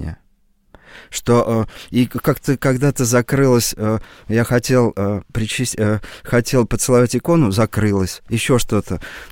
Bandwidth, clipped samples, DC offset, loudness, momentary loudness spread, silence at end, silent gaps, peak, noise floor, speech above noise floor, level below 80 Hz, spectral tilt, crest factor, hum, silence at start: 17 kHz; under 0.1%; 0.4%; -17 LUFS; 7 LU; 0 s; none; -2 dBFS; -57 dBFS; 40 dB; -38 dBFS; -5.5 dB/octave; 16 dB; none; 0 s